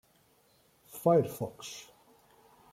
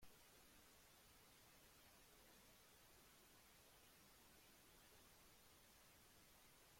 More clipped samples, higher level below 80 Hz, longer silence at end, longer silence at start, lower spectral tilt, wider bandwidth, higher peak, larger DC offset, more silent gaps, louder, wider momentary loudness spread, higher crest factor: neither; first, -74 dBFS vs -80 dBFS; first, 0.9 s vs 0 s; first, 0.95 s vs 0 s; first, -6.5 dB/octave vs -2 dB/octave; about the same, 16.5 kHz vs 16.5 kHz; first, -12 dBFS vs -52 dBFS; neither; neither; first, -31 LUFS vs -69 LUFS; first, 20 LU vs 1 LU; about the same, 22 dB vs 18 dB